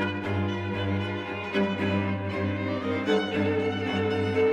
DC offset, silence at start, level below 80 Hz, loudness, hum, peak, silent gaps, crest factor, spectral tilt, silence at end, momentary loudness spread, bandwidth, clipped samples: under 0.1%; 0 s; -60 dBFS; -28 LUFS; none; -12 dBFS; none; 14 dB; -7 dB/octave; 0 s; 4 LU; 8.6 kHz; under 0.1%